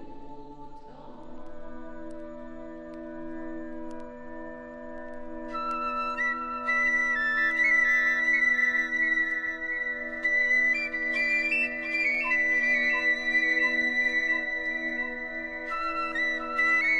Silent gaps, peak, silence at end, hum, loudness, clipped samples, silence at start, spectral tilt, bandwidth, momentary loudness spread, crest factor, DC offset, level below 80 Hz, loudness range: none; -14 dBFS; 0 s; none; -25 LUFS; under 0.1%; 0 s; -2.5 dB/octave; 10.5 kHz; 20 LU; 14 dB; under 0.1%; -54 dBFS; 18 LU